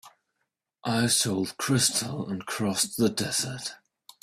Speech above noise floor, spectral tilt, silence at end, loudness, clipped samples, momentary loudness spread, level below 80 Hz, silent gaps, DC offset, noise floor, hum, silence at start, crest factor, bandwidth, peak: 54 dB; -3 dB/octave; 0.45 s; -26 LUFS; under 0.1%; 11 LU; -62 dBFS; none; under 0.1%; -81 dBFS; none; 0.05 s; 20 dB; 16 kHz; -8 dBFS